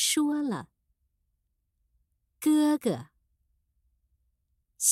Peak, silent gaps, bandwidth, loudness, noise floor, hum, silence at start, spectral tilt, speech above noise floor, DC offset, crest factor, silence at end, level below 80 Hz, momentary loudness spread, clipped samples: -10 dBFS; none; 16 kHz; -27 LUFS; -77 dBFS; none; 0 s; -3 dB/octave; 51 dB; under 0.1%; 22 dB; 0 s; -72 dBFS; 11 LU; under 0.1%